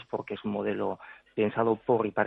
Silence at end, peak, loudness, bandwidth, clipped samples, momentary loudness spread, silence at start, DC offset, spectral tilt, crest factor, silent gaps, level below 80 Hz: 0 s; -10 dBFS; -30 LUFS; 4.1 kHz; under 0.1%; 10 LU; 0 s; under 0.1%; -9.5 dB/octave; 20 dB; none; -68 dBFS